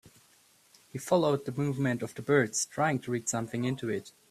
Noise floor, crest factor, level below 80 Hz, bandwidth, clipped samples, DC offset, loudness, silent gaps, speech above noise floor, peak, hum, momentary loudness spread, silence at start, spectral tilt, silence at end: -63 dBFS; 20 dB; -68 dBFS; 15 kHz; under 0.1%; under 0.1%; -30 LUFS; none; 33 dB; -12 dBFS; none; 9 LU; 0.05 s; -5 dB/octave; 0.2 s